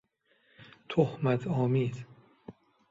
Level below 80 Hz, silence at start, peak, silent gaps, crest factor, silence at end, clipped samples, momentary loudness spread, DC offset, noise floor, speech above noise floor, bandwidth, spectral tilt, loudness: -68 dBFS; 0.6 s; -12 dBFS; none; 20 dB; 0.4 s; under 0.1%; 24 LU; under 0.1%; -70 dBFS; 42 dB; 7.6 kHz; -8.5 dB/octave; -30 LUFS